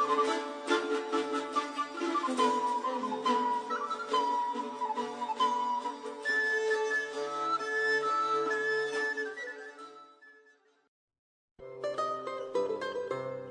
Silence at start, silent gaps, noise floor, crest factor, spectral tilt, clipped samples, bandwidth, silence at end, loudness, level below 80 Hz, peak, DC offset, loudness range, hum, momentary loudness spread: 0 s; 10.88-11.08 s, 11.19-11.55 s; -65 dBFS; 18 dB; -3 dB/octave; under 0.1%; 10 kHz; 0 s; -32 LUFS; -82 dBFS; -16 dBFS; under 0.1%; 8 LU; none; 9 LU